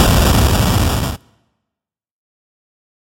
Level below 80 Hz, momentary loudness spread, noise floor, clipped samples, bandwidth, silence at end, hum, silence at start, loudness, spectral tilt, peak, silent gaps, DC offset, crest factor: -22 dBFS; 12 LU; -84 dBFS; under 0.1%; 17 kHz; 1.85 s; none; 0 s; -14 LUFS; -5 dB/octave; 0 dBFS; none; under 0.1%; 16 dB